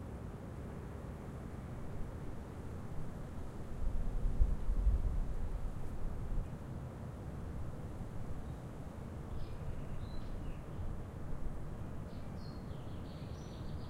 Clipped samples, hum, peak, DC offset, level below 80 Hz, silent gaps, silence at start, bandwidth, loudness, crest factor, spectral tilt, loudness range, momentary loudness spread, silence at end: under 0.1%; none; -18 dBFS; under 0.1%; -42 dBFS; none; 0 s; 11.5 kHz; -45 LUFS; 22 dB; -7.5 dB/octave; 6 LU; 9 LU; 0 s